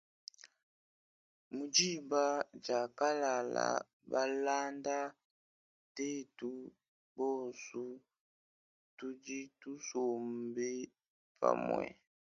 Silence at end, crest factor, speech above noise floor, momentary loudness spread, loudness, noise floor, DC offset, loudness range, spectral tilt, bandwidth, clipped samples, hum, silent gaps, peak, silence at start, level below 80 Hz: 0.4 s; 24 dB; over 53 dB; 16 LU; -37 LUFS; under -90 dBFS; under 0.1%; 9 LU; -2.5 dB/octave; 9 kHz; under 0.1%; none; 0.63-1.51 s, 3.93-4.00 s, 5.25-5.95 s, 6.88-7.15 s, 8.20-8.97 s, 11.08-11.35 s; -14 dBFS; 0.45 s; -82 dBFS